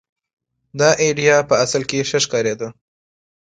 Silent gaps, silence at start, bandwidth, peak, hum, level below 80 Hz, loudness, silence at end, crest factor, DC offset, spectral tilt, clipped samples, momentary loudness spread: none; 0.75 s; 9.4 kHz; 0 dBFS; none; -56 dBFS; -17 LUFS; 0.75 s; 18 dB; under 0.1%; -3 dB/octave; under 0.1%; 13 LU